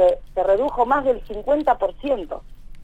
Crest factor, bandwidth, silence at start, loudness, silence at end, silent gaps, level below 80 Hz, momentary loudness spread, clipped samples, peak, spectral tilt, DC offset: 14 dB; 8.6 kHz; 0 s; -21 LUFS; 0 s; none; -40 dBFS; 7 LU; under 0.1%; -6 dBFS; -6.5 dB/octave; under 0.1%